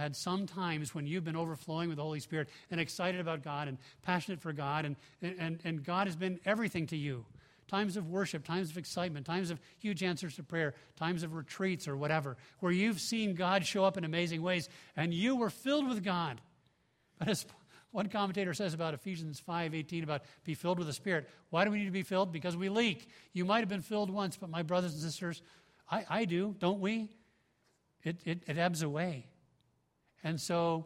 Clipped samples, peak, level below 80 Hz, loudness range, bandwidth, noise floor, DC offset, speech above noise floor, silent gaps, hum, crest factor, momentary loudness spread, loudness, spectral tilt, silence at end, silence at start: under 0.1%; -14 dBFS; -74 dBFS; 4 LU; 16 kHz; -76 dBFS; under 0.1%; 40 dB; none; none; 22 dB; 9 LU; -36 LUFS; -5.5 dB/octave; 0 s; 0 s